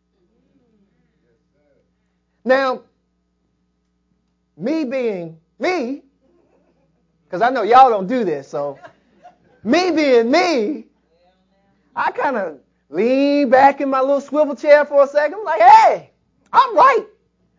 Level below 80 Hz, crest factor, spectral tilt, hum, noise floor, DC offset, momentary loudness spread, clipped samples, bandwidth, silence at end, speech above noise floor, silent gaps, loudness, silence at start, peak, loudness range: -68 dBFS; 18 dB; -5 dB/octave; none; -67 dBFS; under 0.1%; 18 LU; under 0.1%; 7.6 kHz; 0.55 s; 52 dB; none; -15 LUFS; 2.45 s; 0 dBFS; 12 LU